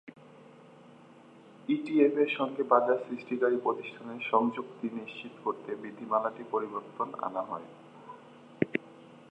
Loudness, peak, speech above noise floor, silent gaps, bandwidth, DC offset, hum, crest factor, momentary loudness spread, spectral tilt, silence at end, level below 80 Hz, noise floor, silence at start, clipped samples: -31 LUFS; -8 dBFS; 24 dB; none; 8.6 kHz; under 0.1%; none; 24 dB; 18 LU; -7.5 dB/octave; 0.05 s; -82 dBFS; -55 dBFS; 0.05 s; under 0.1%